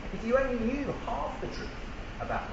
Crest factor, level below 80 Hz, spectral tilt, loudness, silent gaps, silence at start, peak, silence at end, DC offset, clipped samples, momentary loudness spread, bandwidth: 20 dB; -42 dBFS; -6.5 dB/octave; -33 LUFS; none; 0 s; -14 dBFS; 0 s; under 0.1%; under 0.1%; 12 LU; 8 kHz